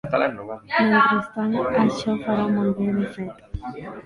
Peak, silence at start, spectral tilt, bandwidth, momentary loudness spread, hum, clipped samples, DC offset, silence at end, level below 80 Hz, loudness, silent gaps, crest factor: -4 dBFS; 0.05 s; -7 dB/octave; 10.5 kHz; 17 LU; none; under 0.1%; under 0.1%; 0.05 s; -46 dBFS; -21 LUFS; none; 18 dB